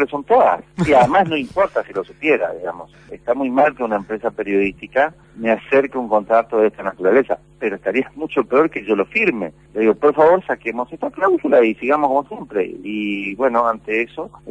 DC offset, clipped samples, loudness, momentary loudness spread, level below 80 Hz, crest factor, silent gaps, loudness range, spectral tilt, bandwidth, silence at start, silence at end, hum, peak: under 0.1%; under 0.1%; -18 LUFS; 11 LU; -52 dBFS; 14 dB; none; 3 LU; -7 dB/octave; 10 kHz; 0 s; 0 s; none; -2 dBFS